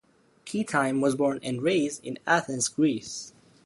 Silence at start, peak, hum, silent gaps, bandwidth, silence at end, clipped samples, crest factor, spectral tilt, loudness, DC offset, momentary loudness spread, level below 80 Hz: 0.45 s; -8 dBFS; none; none; 11.5 kHz; 0.35 s; under 0.1%; 20 dB; -4 dB/octave; -27 LUFS; under 0.1%; 13 LU; -68 dBFS